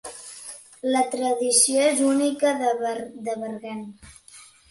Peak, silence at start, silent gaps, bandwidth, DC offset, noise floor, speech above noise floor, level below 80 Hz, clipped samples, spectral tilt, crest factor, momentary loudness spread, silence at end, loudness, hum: -4 dBFS; 0.05 s; none; 12 kHz; under 0.1%; -49 dBFS; 27 dB; -66 dBFS; under 0.1%; -2 dB/octave; 20 dB; 20 LU; 0.25 s; -22 LUFS; none